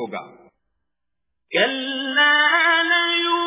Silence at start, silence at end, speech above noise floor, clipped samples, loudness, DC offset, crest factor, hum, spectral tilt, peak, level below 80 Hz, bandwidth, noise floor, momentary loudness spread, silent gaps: 0 s; 0 s; 58 dB; under 0.1%; -17 LUFS; under 0.1%; 16 dB; none; 1.5 dB/octave; -4 dBFS; -70 dBFS; 3.9 kHz; -81 dBFS; 10 LU; none